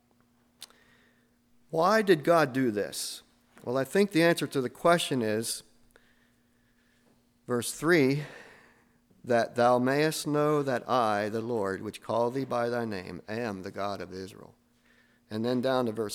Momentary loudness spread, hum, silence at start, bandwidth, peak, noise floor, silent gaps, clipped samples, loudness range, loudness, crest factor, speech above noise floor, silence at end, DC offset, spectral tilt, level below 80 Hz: 14 LU; none; 0.6 s; 17 kHz; -10 dBFS; -67 dBFS; none; under 0.1%; 7 LU; -28 LUFS; 20 dB; 39 dB; 0 s; under 0.1%; -5 dB/octave; -70 dBFS